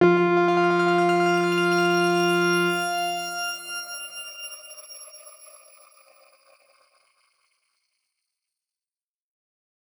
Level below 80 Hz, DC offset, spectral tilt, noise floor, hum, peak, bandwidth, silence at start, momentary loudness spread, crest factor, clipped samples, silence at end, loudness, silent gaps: -76 dBFS; under 0.1%; -5 dB/octave; under -90 dBFS; none; -6 dBFS; over 20 kHz; 0 s; 20 LU; 18 dB; under 0.1%; 4.7 s; -22 LUFS; none